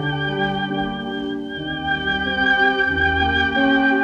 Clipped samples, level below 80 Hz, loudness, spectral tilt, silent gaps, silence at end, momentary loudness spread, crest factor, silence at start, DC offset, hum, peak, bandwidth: under 0.1%; -40 dBFS; -19 LUFS; -6.5 dB/octave; none; 0 s; 10 LU; 14 dB; 0 s; under 0.1%; none; -6 dBFS; 7.6 kHz